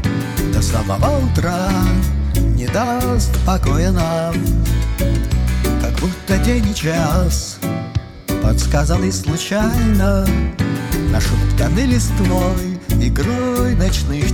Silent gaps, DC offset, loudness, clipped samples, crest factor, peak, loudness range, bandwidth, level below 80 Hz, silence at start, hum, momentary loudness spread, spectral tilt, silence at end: none; under 0.1%; -17 LUFS; under 0.1%; 14 dB; -2 dBFS; 1 LU; 19 kHz; -20 dBFS; 0 s; none; 4 LU; -6 dB/octave; 0 s